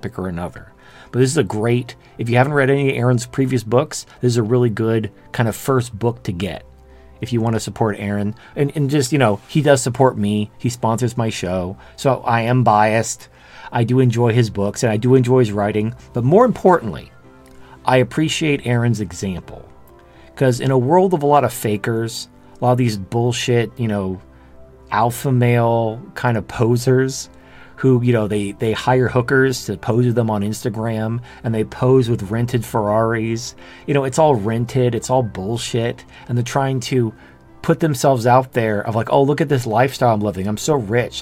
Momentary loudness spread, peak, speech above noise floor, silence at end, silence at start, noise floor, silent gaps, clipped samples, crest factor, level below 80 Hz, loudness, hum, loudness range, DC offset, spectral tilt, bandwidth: 10 LU; 0 dBFS; 27 dB; 0 s; 0.05 s; -44 dBFS; none; under 0.1%; 18 dB; -48 dBFS; -18 LUFS; none; 4 LU; under 0.1%; -6 dB/octave; 16 kHz